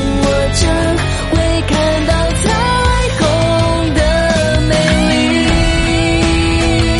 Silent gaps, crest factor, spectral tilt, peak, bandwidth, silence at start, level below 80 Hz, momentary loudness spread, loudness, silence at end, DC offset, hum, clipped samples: none; 12 dB; -5 dB/octave; 0 dBFS; 11.5 kHz; 0 s; -20 dBFS; 2 LU; -13 LUFS; 0 s; under 0.1%; none; under 0.1%